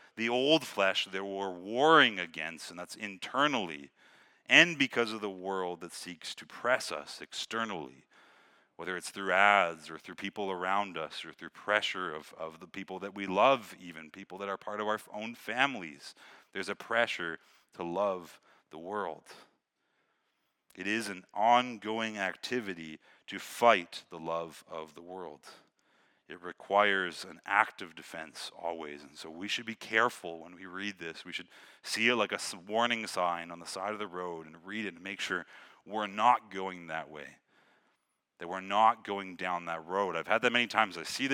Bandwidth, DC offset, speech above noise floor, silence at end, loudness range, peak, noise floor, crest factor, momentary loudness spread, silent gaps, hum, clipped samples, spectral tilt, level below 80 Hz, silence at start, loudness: 18 kHz; under 0.1%; 47 dB; 0 s; 7 LU; -4 dBFS; -79 dBFS; 28 dB; 19 LU; none; none; under 0.1%; -3 dB/octave; -84 dBFS; 0.15 s; -31 LUFS